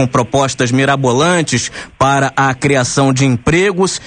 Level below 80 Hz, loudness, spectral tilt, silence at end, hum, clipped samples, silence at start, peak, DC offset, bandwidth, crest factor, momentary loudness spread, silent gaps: -38 dBFS; -13 LUFS; -4.5 dB/octave; 0 s; none; under 0.1%; 0 s; 0 dBFS; under 0.1%; 10 kHz; 12 dB; 3 LU; none